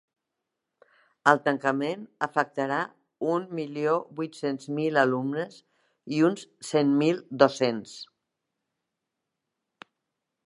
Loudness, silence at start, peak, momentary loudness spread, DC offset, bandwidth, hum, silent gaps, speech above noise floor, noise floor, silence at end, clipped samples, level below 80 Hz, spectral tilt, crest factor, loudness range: -27 LUFS; 1.25 s; -2 dBFS; 13 LU; under 0.1%; 11.5 kHz; none; none; 58 dB; -84 dBFS; 2.4 s; under 0.1%; -80 dBFS; -5.5 dB/octave; 26 dB; 3 LU